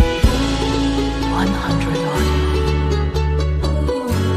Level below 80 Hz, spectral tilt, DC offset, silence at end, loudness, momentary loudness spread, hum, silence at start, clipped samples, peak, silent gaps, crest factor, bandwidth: -22 dBFS; -6 dB/octave; under 0.1%; 0 s; -19 LUFS; 2 LU; none; 0 s; under 0.1%; -2 dBFS; none; 14 dB; 14.5 kHz